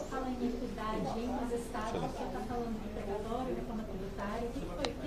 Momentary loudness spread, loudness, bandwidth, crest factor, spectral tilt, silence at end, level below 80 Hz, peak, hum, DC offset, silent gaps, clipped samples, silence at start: 4 LU; -38 LUFS; 15.5 kHz; 22 dB; -6 dB/octave; 0 s; -46 dBFS; -16 dBFS; none; under 0.1%; none; under 0.1%; 0 s